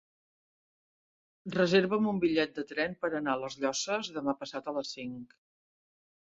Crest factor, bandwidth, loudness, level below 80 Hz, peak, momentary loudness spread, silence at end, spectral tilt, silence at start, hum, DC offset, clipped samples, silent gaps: 20 dB; 8 kHz; -31 LUFS; -72 dBFS; -12 dBFS; 13 LU; 1.05 s; -4.5 dB/octave; 1.45 s; none; under 0.1%; under 0.1%; none